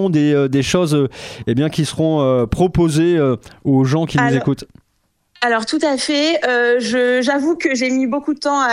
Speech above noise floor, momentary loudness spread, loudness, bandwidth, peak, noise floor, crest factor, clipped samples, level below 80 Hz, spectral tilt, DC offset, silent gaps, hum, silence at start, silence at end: 49 dB; 5 LU; -16 LUFS; 13.5 kHz; -2 dBFS; -65 dBFS; 14 dB; under 0.1%; -42 dBFS; -5.5 dB/octave; under 0.1%; none; none; 0 s; 0 s